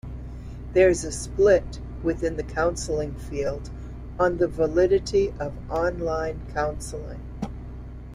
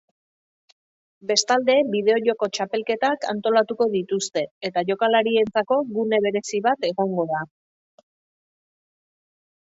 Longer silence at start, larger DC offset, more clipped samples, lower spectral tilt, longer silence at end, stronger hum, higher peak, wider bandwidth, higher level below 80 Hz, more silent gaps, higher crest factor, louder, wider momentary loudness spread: second, 0.05 s vs 1.25 s; neither; neither; first, -5.5 dB/octave vs -3.5 dB/octave; second, 0 s vs 2.25 s; neither; about the same, -8 dBFS vs -6 dBFS; first, 12.5 kHz vs 8 kHz; first, -38 dBFS vs -70 dBFS; second, none vs 4.51-4.61 s; about the same, 18 dB vs 18 dB; second, -25 LUFS vs -22 LUFS; first, 18 LU vs 7 LU